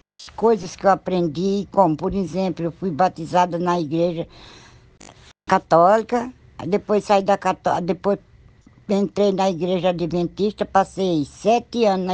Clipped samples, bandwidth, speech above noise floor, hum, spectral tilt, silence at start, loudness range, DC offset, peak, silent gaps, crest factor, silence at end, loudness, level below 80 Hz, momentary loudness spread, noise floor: under 0.1%; 9.2 kHz; 30 dB; none; -6.5 dB/octave; 0.2 s; 2 LU; under 0.1%; 0 dBFS; none; 20 dB; 0 s; -20 LUFS; -50 dBFS; 7 LU; -50 dBFS